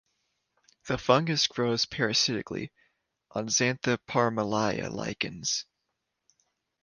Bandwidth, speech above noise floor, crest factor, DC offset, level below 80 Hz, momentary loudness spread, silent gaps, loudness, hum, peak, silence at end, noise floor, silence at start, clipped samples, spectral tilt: 11 kHz; 54 dB; 24 dB; under 0.1%; -62 dBFS; 10 LU; none; -28 LUFS; none; -6 dBFS; 1.2 s; -82 dBFS; 0.85 s; under 0.1%; -3.5 dB/octave